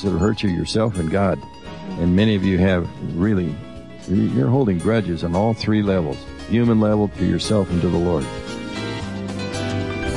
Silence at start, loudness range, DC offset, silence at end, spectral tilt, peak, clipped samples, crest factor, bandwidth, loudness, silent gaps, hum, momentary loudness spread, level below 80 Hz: 0 s; 2 LU; 0.6%; 0 s; -7 dB/octave; -8 dBFS; under 0.1%; 12 dB; 11.5 kHz; -20 LUFS; none; none; 11 LU; -42 dBFS